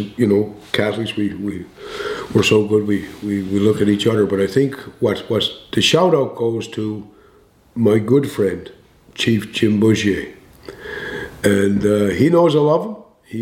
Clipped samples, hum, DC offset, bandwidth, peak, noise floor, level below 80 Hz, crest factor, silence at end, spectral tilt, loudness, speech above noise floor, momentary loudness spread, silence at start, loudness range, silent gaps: under 0.1%; none; under 0.1%; 16.5 kHz; 0 dBFS; -51 dBFS; -50 dBFS; 16 dB; 0 s; -5.5 dB/octave; -17 LUFS; 34 dB; 14 LU; 0 s; 3 LU; none